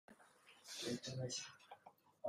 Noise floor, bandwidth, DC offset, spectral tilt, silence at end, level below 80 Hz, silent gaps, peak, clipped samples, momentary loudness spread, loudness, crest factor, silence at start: -68 dBFS; 15.5 kHz; under 0.1%; -3.5 dB/octave; 0 s; -82 dBFS; none; -32 dBFS; under 0.1%; 21 LU; -47 LUFS; 18 dB; 0.1 s